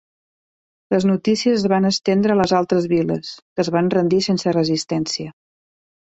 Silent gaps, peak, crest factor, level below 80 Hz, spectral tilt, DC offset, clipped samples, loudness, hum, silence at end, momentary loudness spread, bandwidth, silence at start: 3.42-3.56 s; -4 dBFS; 16 dB; -56 dBFS; -5.5 dB/octave; under 0.1%; under 0.1%; -19 LUFS; none; 0.7 s; 7 LU; 8.2 kHz; 0.9 s